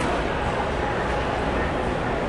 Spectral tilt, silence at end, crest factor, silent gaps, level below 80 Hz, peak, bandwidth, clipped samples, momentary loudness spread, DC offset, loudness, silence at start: -6 dB/octave; 0 s; 12 dB; none; -34 dBFS; -12 dBFS; 11.5 kHz; under 0.1%; 1 LU; under 0.1%; -25 LUFS; 0 s